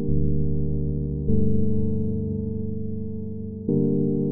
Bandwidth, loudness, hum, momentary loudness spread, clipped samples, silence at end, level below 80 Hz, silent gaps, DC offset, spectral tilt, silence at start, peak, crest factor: 1 kHz; -26 LUFS; none; 9 LU; under 0.1%; 0 s; -34 dBFS; none; under 0.1%; -19.5 dB/octave; 0 s; -8 dBFS; 14 dB